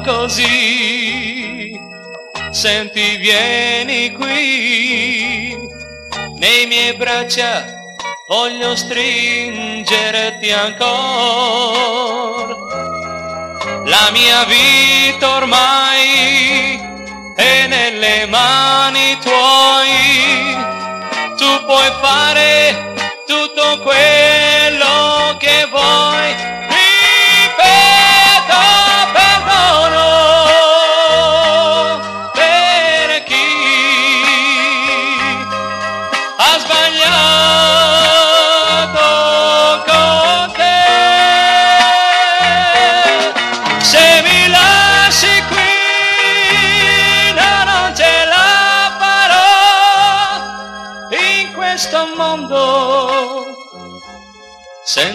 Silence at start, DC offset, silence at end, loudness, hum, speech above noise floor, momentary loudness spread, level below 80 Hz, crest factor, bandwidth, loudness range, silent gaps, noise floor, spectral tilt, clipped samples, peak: 0 s; under 0.1%; 0 s; -9 LUFS; none; 25 dB; 13 LU; -44 dBFS; 12 dB; 15.5 kHz; 7 LU; none; -38 dBFS; -1.5 dB/octave; under 0.1%; 0 dBFS